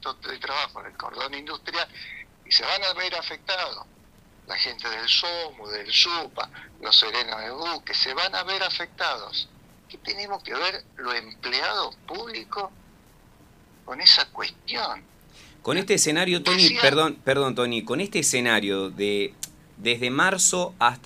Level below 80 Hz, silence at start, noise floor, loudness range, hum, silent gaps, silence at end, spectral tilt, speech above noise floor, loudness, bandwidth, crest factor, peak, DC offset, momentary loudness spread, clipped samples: -60 dBFS; 0 s; -54 dBFS; 8 LU; none; none; 0.05 s; -1.5 dB/octave; 29 dB; -23 LUFS; 15.5 kHz; 26 dB; 0 dBFS; under 0.1%; 16 LU; under 0.1%